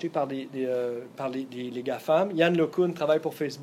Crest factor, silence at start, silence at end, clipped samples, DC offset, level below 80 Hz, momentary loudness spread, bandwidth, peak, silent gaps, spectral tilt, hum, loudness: 18 dB; 0 s; 0 s; under 0.1%; under 0.1%; -78 dBFS; 10 LU; 16 kHz; -8 dBFS; none; -6.5 dB/octave; none; -28 LUFS